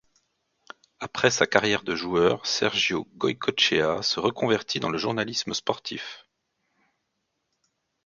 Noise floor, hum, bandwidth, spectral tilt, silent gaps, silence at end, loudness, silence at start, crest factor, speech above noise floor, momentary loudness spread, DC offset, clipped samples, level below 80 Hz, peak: -78 dBFS; none; 7.6 kHz; -3 dB/octave; none; 1.85 s; -24 LUFS; 1 s; 26 dB; 53 dB; 10 LU; under 0.1%; under 0.1%; -60 dBFS; 0 dBFS